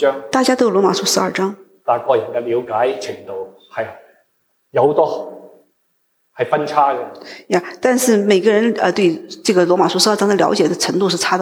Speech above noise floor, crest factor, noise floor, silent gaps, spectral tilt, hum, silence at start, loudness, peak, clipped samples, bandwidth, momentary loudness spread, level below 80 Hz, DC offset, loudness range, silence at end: 50 dB; 16 dB; -65 dBFS; none; -4 dB/octave; none; 0 s; -16 LUFS; 0 dBFS; under 0.1%; 19.5 kHz; 13 LU; -66 dBFS; under 0.1%; 7 LU; 0 s